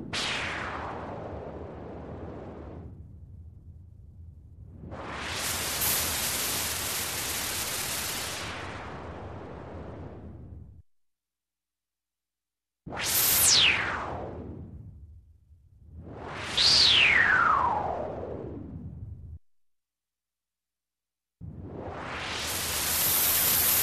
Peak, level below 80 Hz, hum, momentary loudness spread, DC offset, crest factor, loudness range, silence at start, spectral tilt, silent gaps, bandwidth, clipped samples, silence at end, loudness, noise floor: -10 dBFS; -50 dBFS; none; 24 LU; under 0.1%; 20 dB; 22 LU; 0 s; -1 dB/octave; none; 14.5 kHz; under 0.1%; 0 s; -24 LUFS; under -90 dBFS